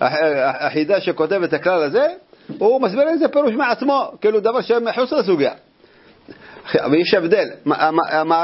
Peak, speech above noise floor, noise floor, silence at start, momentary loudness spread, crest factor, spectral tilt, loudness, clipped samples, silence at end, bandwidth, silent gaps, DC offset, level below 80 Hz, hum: 0 dBFS; 33 dB; -50 dBFS; 0 s; 5 LU; 18 dB; -9 dB/octave; -18 LUFS; under 0.1%; 0 s; 5.8 kHz; none; under 0.1%; -66 dBFS; none